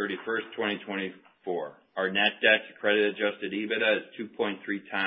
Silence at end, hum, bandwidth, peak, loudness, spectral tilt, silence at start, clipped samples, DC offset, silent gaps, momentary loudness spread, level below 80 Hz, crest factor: 0 s; none; 5.4 kHz; -8 dBFS; -28 LUFS; -8 dB/octave; 0 s; under 0.1%; under 0.1%; none; 12 LU; -78 dBFS; 20 dB